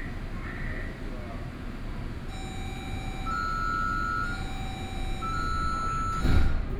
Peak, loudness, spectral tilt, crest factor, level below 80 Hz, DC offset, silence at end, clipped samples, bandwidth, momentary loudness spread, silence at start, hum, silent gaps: -10 dBFS; -32 LUFS; -5.5 dB/octave; 18 dB; -32 dBFS; under 0.1%; 0 s; under 0.1%; 12.5 kHz; 11 LU; 0 s; none; none